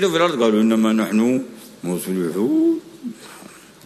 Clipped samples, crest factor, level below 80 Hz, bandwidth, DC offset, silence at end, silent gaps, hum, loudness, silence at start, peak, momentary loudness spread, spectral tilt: under 0.1%; 16 dB; -66 dBFS; 13.5 kHz; under 0.1%; 0.4 s; none; none; -19 LUFS; 0 s; -4 dBFS; 19 LU; -5.5 dB/octave